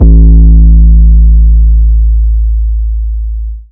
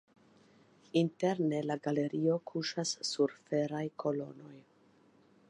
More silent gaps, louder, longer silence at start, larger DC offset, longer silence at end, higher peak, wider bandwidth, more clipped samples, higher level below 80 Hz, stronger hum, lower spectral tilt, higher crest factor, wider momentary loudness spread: neither; first, -8 LUFS vs -34 LUFS; second, 0 s vs 0.95 s; neither; second, 0.1 s vs 0.9 s; first, 0 dBFS vs -18 dBFS; second, 0.7 kHz vs 10.5 kHz; first, 10% vs under 0.1%; first, -4 dBFS vs -84 dBFS; neither; first, -17 dB/octave vs -5 dB/octave; second, 4 dB vs 18 dB; first, 12 LU vs 6 LU